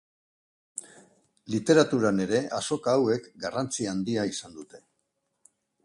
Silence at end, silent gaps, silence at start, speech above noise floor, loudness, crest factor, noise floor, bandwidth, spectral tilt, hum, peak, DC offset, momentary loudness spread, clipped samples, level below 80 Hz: 1.05 s; none; 0.75 s; 52 dB; -26 LUFS; 22 dB; -78 dBFS; 11.5 kHz; -5 dB/octave; none; -8 dBFS; under 0.1%; 19 LU; under 0.1%; -66 dBFS